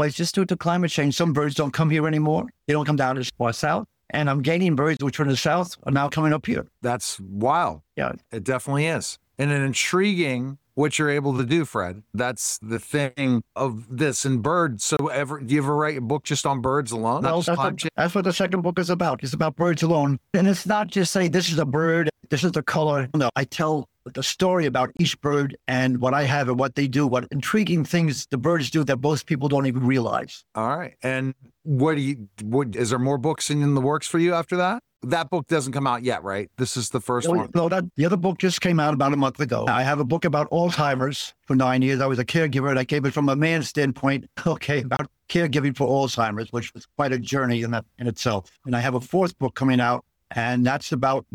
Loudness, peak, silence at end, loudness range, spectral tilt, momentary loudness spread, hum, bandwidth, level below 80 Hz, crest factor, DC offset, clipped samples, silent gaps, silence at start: -23 LUFS; -10 dBFS; 0.15 s; 3 LU; -5.5 dB/octave; 6 LU; none; 17 kHz; -58 dBFS; 14 dB; under 0.1%; under 0.1%; none; 0 s